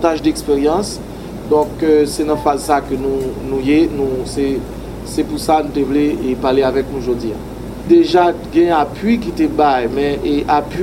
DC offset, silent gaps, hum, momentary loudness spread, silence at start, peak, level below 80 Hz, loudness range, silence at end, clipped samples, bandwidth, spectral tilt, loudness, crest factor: under 0.1%; none; none; 10 LU; 0 s; 0 dBFS; -34 dBFS; 3 LU; 0 s; under 0.1%; 16.5 kHz; -6 dB/octave; -16 LUFS; 14 dB